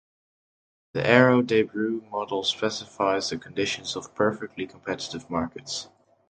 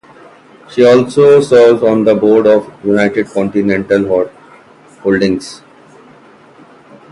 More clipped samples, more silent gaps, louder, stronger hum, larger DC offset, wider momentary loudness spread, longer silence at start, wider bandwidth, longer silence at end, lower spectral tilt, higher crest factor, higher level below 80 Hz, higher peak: neither; neither; second, -26 LUFS vs -11 LUFS; neither; neither; first, 15 LU vs 10 LU; first, 0.95 s vs 0.7 s; second, 9.2 kHz vs 11 kHz; second, 0.45 s vs 1.55 s; second, -4.5 dB/octave vs -6.5 dB/octave; first, 24 dB vs 12 dB; second, -60 dBFS vs -50 dBFS; about the same, -2 dBFS vs 0 dBFS